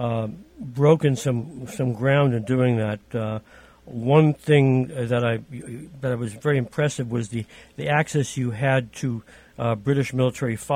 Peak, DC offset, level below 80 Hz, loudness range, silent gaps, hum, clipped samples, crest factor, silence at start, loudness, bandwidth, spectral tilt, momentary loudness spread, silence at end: -4 dBFS; under 0.1%; -56 dBFS; 4 LU; none; none; under 0.1%; 18 dB; 0 s; -23 LUFS; 15 kHz; -7 dB/octave; 15 LU; 0 s